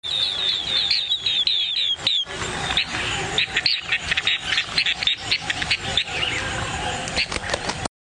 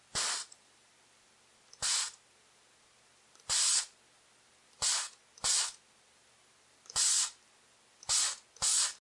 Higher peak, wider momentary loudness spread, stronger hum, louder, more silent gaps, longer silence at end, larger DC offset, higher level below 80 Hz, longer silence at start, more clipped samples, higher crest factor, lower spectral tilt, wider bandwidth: first, -6 dBFS vs -16 dBFS; second, 7 LU vs 13 LU; neither; first, -21 LUFS vs -30 LUFS; neither; first, 0.35 s vs 0.15 s; neither; first, -44 dBFS vs -70 dBFS; about the same, 0.05 s vs 0.15 s; neither; about the same, 18 dB vs 20 dB; first, -1.5 dB/octave vs 2.5 dB/octave; about the same, 10.5 kHz vs 11.5 kHz